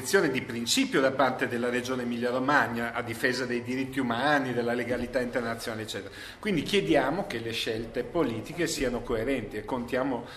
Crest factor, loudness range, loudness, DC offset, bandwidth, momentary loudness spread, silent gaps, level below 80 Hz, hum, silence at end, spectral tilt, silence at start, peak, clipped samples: 22 dB; 3 LU; -28 LUFS; under 0.1%; 14 kHz; 8 LU; none; -52 dBFS; none; 0 s; -4 dB/octave; 0 s; -8 dBFS; under 0.1%